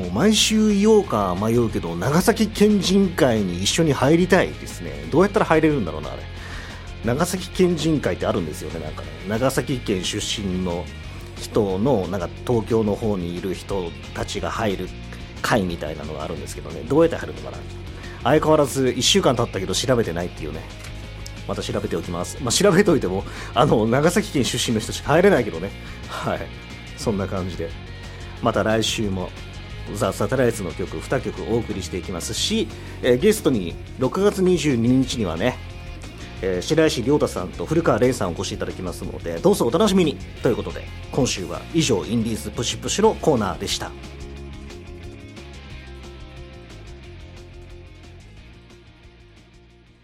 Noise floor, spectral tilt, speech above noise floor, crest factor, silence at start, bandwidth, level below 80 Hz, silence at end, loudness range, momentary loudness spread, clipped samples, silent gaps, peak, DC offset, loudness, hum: -50 dBFS; -5 dB/octave; 29 dB; 22 dB; 0 s; 16 kHz; -38 dBFS; 0.8 s; 7 LU; 19 LU; under 0.1%; none; 0 dBFS; under 0.1%; -21 LUFS; none